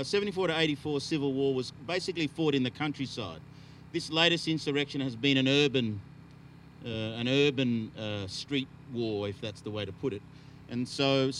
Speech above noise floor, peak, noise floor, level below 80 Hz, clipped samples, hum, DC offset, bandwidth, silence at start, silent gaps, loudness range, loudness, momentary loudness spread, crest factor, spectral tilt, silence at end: 21 dB; -8 dBFS; -52 dBFS; -64 dBFS; under 0.1%; none; under 0.1%; 11.5 kHz; 0 s; none; 4 LU; -30 LUFS; 14 LU; 22 dB; -5 dB/octave; 0 s